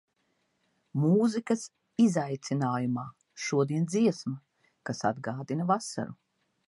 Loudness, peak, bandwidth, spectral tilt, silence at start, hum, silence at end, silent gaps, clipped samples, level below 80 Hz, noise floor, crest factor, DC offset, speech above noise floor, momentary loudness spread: -30 LUFS; -12 dBFS; 11.5 kHz; -6.5 dB/octave; 0.95 s; none; 0.55 s; none; under 0.1%; -74 dBFS; -75 dBFS; 18 dB; under 0.1%; 47 dB; 13 LU